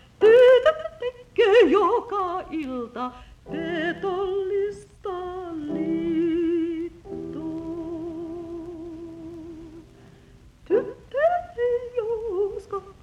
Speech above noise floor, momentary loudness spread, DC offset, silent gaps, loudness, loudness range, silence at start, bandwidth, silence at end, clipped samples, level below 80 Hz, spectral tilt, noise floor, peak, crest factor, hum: 25 dB; 19 LU; under 0.1%; none; -23 LUFS; 12 LU; 0.2 s; 9.4 kHz; 0.1 s; under 0.1%; -54 dBFS; -6 dB/octave; -51 dBFS; -6 dBFS; 18 dB; none